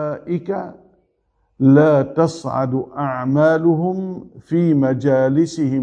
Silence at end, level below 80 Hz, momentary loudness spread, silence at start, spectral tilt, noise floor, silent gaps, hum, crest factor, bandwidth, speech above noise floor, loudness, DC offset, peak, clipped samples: 0 s; -58 dBFS; 13 LU; 0 s; -8.5 dB/octave; -65 dBFS; none; none; 16 dB; 9.2 kHz; 49 dB; -17 LUFS; under 0.1%; -2 dBFS; under 0.1%